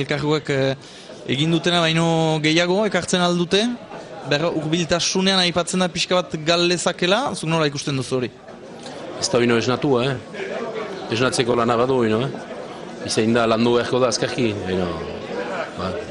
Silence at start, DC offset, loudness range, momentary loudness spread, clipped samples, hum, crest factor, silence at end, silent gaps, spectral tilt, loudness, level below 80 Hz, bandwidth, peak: 0 s; under 0.1%; 3 LU; 14 LU; under 0.1%; none; 18 dB; 0 s; none; -4.5 dB/octave; -20 LUFS; -52 dBFS; 11 kHz; -4 dBFS